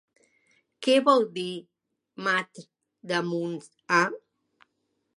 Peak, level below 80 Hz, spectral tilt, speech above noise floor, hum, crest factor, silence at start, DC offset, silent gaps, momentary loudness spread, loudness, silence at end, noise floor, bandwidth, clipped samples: -8 dBFS; -82 dBFS; -4.5 dB/octave; 52 dB; none; 22 dB; 0.8 s; under 0.1%; none; 19 LU; -26 LUFS; 1 s; -77 dBFS; 11.5 kHz; under 0.1%